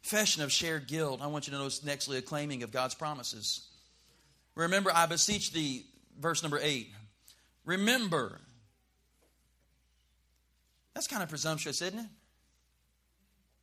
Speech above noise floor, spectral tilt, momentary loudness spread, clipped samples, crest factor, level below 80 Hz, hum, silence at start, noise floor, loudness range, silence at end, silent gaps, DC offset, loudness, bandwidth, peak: 40 dB; -2.5 dB/octave; 11 LU; under 0.1%; 24 dB; -68 dBFS; none; 0.05 s; -73 dBFS; 8 LU; 1.55 s; none; under 0.1%; -32 LUFS; 15.5 kHz; -12 dBFS